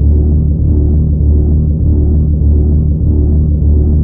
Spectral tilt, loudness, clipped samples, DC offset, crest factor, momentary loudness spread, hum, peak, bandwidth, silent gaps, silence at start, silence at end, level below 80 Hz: -18 dB/octave; -11 LUFS; under 0.1%; under 0.1%; 8 dB; 1 LU; none; 0 dBFS; 1.1 kHz; none; 0 s; 0 s; -10 dBFS